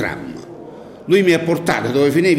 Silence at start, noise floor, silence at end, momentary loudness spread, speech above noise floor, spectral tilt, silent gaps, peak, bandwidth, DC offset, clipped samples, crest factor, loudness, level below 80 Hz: 0 s; -36 dBFS; 0 s; 21 LU; 20 dB; -6 dB/octave; none; -4 dBFS; 16 kHz; under 0.1%; under 0.1%; 14 dB; -16 LUFS; -52 dBFS